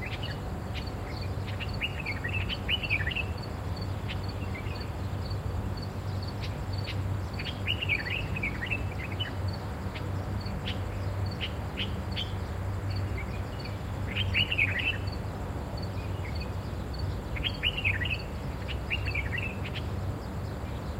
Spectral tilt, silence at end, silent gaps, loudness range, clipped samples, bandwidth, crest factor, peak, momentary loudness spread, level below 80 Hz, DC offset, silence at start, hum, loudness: -5.5 dB/octave; 0 s; none; 4 LU; under 0.1%; 16 kHz; 20 dB; -12 dBFS; 8 LU; -40 dBFS; under 0.1%; 0 s; none; -32 LUFS